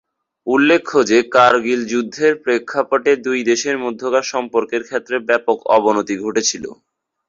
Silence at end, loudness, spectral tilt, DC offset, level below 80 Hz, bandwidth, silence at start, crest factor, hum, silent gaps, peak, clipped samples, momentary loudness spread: 0.55 s; -16 LUFS; -3 dB/octave; under 0.1%; -60 dBFS; 7.8 kHz; 0.45 s; 16 dB; none; none; -2 dBFS; under 0.1%; 8 LU